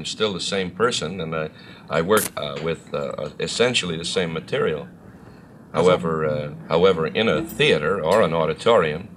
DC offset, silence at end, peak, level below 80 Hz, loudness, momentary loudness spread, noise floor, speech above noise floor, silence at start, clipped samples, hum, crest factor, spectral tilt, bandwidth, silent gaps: under 0.1%; 0 s; -4 dBFS; -52 dBFS; -21 LUFS; 10 LU; -44 dBFS; 23 dB; 0 s; under 0.1%; none; 18 dB; -4.5 dB/octave; 15.5 kHz; none